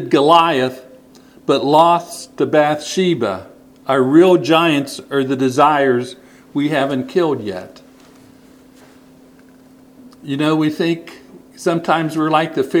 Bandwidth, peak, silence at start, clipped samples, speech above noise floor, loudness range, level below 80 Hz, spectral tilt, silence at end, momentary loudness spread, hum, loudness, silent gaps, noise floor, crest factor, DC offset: 15.5 kHz; 0 dBFS; 0 s; under 0.1%; 30 dB; 10 LU; -62 dBFS; -5.5 dB/octave; 0 s; 15 LU; none; -16 LUFS; none; -45 dBFS; 16 dB; under 0.1%